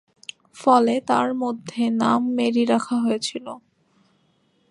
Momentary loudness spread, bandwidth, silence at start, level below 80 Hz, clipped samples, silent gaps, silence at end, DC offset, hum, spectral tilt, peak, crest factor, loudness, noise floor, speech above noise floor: 21 LU; 11 kHz; 0.55 s; -72 dBFS; under 0.1%; none; 1.1 s; under 0.1%; none; -5 dB/octave; -4 dBFS; 18 dB; -21 LUFS; -64 dBFS; 44 dB